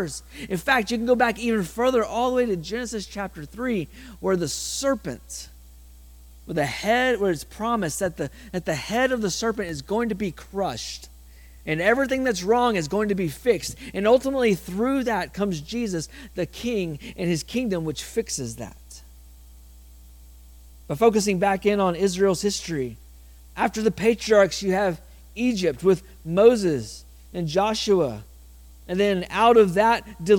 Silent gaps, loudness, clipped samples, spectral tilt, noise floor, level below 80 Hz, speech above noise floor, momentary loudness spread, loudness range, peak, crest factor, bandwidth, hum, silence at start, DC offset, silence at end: none; -23 LUFS; under 0.1%; -4.5 dB/octave; -46 dBFS; -46 dBFS; 23 dB; 13 LU; 6 LU; -4 dBFS; 20 dB; 18 kHz; none; 0 s; under 0.1%; 0 s